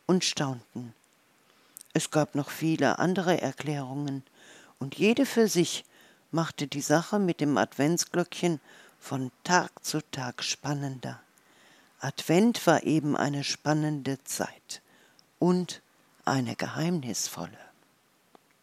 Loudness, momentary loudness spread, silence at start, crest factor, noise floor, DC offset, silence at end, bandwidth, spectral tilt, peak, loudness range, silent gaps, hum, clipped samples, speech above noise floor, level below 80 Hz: -28 LUFS; 15 LU; 0.1 s; 24 dB; -66 dBFS; under 0.1%; 1 s; 16 kHz; -4.5 dB/octave; -6 dBFS; 4 LU; none; none; under 0.1%; 38 dB; -78 dBFS